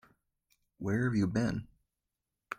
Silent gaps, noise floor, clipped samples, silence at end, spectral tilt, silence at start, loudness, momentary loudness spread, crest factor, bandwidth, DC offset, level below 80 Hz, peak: none; -88 dBFS; under 0.1%; 0.05 s; -7.5 dB/octave; 0.8 s; -33 LUFS; 11 LU; 18 dB; 15 kHz; under 0.1%; -60 dBFS; -18 dBFS